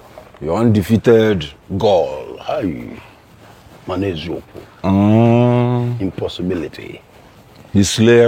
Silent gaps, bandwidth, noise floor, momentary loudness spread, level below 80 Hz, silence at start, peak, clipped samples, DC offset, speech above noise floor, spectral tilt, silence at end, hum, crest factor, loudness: none; 16 kHz; -43 dBFS; 17 LU; -44 dBFS; 0.15 s; 0 dBFS; under 0.1%; under 0.1%; 28 dB; -6.5 dB/octave; 0 s; none; 16 dB; -16 LUFS